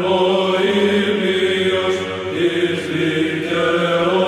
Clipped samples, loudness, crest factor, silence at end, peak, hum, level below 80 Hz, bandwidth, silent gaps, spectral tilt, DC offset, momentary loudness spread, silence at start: under 0.1%; -17 LUFS; 12 dB; 0 s; -4 dBFS; none; -58 dBFS; 12.5 kHz; none; -5.5 dB/octave; under 0.1%; 4 LU; 0 s